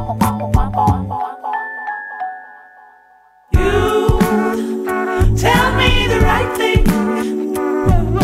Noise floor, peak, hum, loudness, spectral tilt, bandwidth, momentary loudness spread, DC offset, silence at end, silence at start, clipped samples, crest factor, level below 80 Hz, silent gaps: -49 dBFS; 0 dBFS; none; -16 LUFS; -6 dB/octave; 16 kHz; 11 LU; under 0.1%; 0 s; 0 s; under 0.1%; 14 dB; -22 dBFS; none